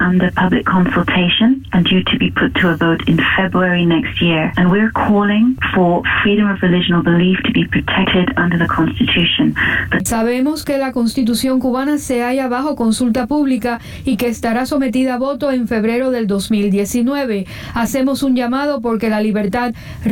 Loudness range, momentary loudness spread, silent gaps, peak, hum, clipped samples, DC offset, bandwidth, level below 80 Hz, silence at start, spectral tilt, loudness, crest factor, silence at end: 3 LU; 5 LU; none; -4 dBFS; none; under 0.1%; under 0.1%; 17 kHz; -38 dBFS; 0 s; -5.5 dB/octave; -15 LUFS; 10 dB; 0 s